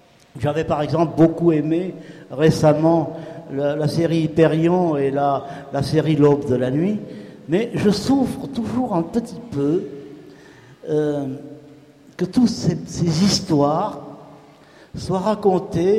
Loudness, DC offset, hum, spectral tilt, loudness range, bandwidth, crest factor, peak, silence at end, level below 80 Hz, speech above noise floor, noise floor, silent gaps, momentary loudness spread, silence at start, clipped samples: -20 LUFS; under 0.1%; none; -6.5 dB/octave; 6 LU; 14 kHz; 16 dB; -4 dBFS; 0 s; -50 dBFS; 28 dB; -47 dBFS; none; 17 LU; 0.35 s; under 0.1%